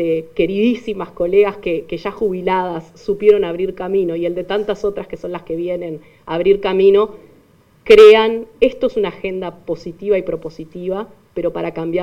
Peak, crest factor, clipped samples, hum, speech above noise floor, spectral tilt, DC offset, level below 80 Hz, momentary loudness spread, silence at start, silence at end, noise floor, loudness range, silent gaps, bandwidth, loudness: 0 dBFS; 16 dB; under 0.1%; none; 35 dB; -6.5 dB/octave; under 0.1%; -46 dBFS; 14 LU; 0 s; 0 s; -51 dBFS; 8 LU; none; 7.8 kHz; -16 LUFS